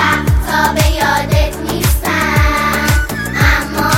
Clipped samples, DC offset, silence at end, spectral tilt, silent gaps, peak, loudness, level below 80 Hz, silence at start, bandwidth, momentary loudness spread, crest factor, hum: under 0.1%; under 0.1%; 0 s; -4.5 dB/octave; none; 0 dBFS; -13 LUFS; -18 dBFS; 0 s; 17 kHz; 3 LU; 12 dB; none